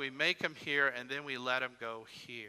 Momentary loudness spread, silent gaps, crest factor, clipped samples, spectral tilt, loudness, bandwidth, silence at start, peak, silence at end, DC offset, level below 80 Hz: 13 LU; none; 20 dB; under 0.1%; -3 dB/octave; -34 LUFS; 14 kHz; 0 s; -16 dBFS; 0 s; under 0.1%; -84 dBFS